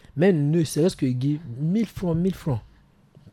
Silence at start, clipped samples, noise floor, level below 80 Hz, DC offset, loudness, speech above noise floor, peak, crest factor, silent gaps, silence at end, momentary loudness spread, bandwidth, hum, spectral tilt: 0.15 s; under 0.1%; -54 dBFS; -50 dBFS; under 0.1%; -24 LUFS; 32 dB; -8 dBFS; 16 dB; none; 0.05 s; 8 LU; 14 kHz; none; -7.5 dB/octave